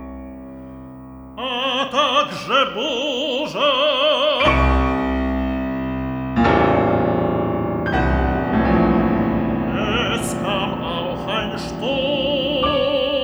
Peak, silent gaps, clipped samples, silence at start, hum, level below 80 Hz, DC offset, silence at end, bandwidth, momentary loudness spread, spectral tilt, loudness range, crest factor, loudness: -2 dBFS; none; under 0.1%; 0 s; none; -30 dBFS; under 0.1%; 0 s; over 20 kHz; 9 LU; -5.5 dB/octave; 3 LU; 16 dB; -19 LUFS